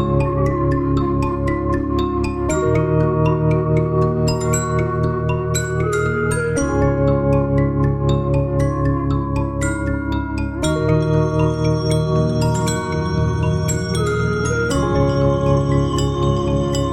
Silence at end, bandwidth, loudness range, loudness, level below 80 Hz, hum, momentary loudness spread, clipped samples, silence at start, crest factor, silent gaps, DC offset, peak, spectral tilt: 0 s; 13 kHz; 1 LU; -18 LUFS; -30 dBFS; none; 4 LU; under 0.1%; 0 s; 14 dB; none; under 0.1%; -4 dBFS; -6.5 dB/octave